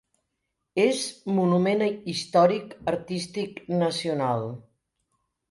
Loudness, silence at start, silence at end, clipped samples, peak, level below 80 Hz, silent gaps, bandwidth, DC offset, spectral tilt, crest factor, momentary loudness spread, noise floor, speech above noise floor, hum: -25 LUFS; 0.75 s; 0.9 s; under 0.1%; -8 dBFS; -66 dBFS; none; 11.5 kHz; under 0.1%; -5.5 dB/octave; 20 dB; 11 LU; -80 dBFS; 55 dB; none